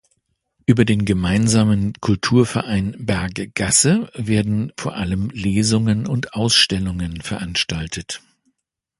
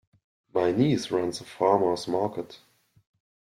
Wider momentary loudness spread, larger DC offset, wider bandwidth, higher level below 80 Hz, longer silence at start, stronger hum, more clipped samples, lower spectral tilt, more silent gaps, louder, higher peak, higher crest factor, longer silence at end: first, 12 LU vs 9 LU; neither; second, 11.5 kHz vs 14 kHz; first, -40 dBFS vs -66 dBFS; first, 0.7 s vs 0.55 s; neither; neither; second, -4.5 dB/octave vs -6 dB/octave; neither; first, -19 LUFS vs -26 LUFS; first, 0 dBFS vs -8 dBFS; about the same, 18 dB vs 18 dB; second, 0.8 s vs 0.95 s